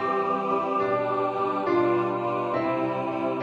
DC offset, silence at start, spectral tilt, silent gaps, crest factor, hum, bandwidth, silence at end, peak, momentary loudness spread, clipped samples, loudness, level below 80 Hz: under 0.1%; 0 s; -8 dB/octave; none; 12 dB; none; 7.6 kHz; 0 s; -12 dBFS; 4 LU; under 0.1%; -25 LUFS; -66 dBFS